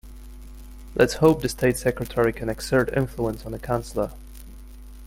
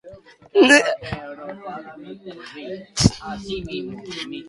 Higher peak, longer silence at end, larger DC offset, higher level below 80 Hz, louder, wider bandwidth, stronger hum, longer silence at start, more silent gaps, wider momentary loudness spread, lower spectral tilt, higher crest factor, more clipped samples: about the same, -2 dBFS vs 0 dBFS; about the same, 0 s vs 0 s; neither; about the same, -40 dBFS vs -42 dBFS; second, -24 LUFS vs -19 LUFS; first, 16.5 kHz vs 11.5 kHz; neither; about the same, 0.05 s vs 0.05 s; neither; about the same, 25 LU vs 24 LU; first, -6 dB/octave vs -4 dB/octave; about the same, 22 dB vs 22 dB; neither